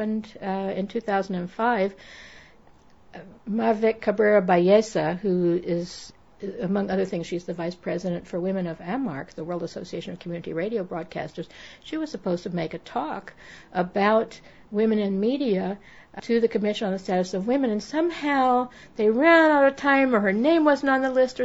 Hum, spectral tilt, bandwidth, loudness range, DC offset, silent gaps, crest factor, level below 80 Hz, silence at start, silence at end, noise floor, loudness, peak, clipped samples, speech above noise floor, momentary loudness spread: none; -6.5 dB/octave; 8 kHz; 10 LU; 0.2%; none; 20 dB; -60 dBFS; 0 s; 0 s; -55 dBFS; -24 LUFS; -4 dBFS; under 0.1%; 31 dB; 15 LU